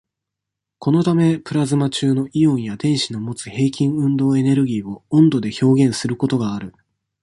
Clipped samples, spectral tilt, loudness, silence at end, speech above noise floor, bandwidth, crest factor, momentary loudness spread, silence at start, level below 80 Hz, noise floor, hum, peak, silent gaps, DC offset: under 0.1%; -6.5 dB/octave; -18 LUFS; 0.55 s; 65 dB; 11.5 kHz; 16 dB; 10 LU; 0.8 s; -56 dBFS; -83 dBFS; none; -2 dBFS; none; under 0.1%